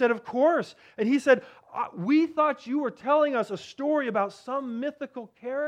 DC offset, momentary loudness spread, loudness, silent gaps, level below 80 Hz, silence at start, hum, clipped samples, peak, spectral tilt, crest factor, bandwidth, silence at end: under 0.1%; 11 LU; -26 LUFS; none; -78 dBFS; 0 s; none; under 0.1%; -8 dBFS; -6 dB/octave; 18 dB; 10 kHz; 0 s